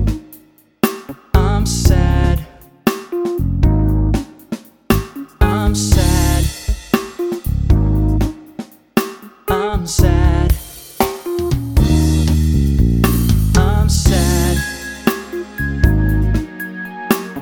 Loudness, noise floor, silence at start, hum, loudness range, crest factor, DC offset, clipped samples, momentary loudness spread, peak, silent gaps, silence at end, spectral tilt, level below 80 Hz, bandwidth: -17 LUFS; -45 dBFS; 0 s; none; 4 LU; 16 dB; under 0.1%; under 0.1%; 13 LU; 0 dBFS; none; 0 s; -6 dB/octave; -18 dBFS; 20 kHz